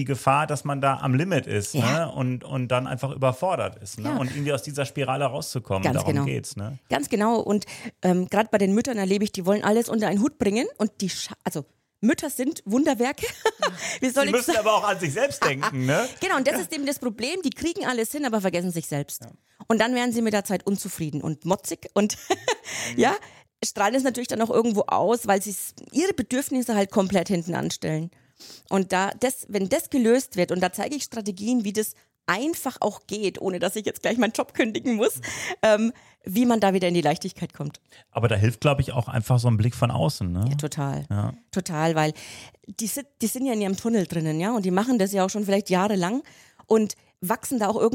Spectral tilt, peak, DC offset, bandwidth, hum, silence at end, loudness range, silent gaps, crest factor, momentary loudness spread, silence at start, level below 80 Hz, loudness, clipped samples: -5 dB/octave; -4 dBFS; under 0.1%; 17 kHz; none; 0 s; 3 LU; none; 20 dB; 8 LU; 0 s; -58 dBFS; -25 LUFS; under 0.1%